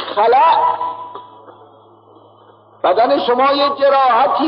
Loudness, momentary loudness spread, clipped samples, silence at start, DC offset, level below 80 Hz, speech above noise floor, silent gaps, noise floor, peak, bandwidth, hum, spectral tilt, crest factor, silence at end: -13 LUFS; 15 LU; under 0.1%; 0 s; under 0.1%; -72 dBFS; 33 dB; none; -46 dBFS; -4 dBFS; 5.6 kHz; none; -7.5 dB/octave; 12 dB; 0 s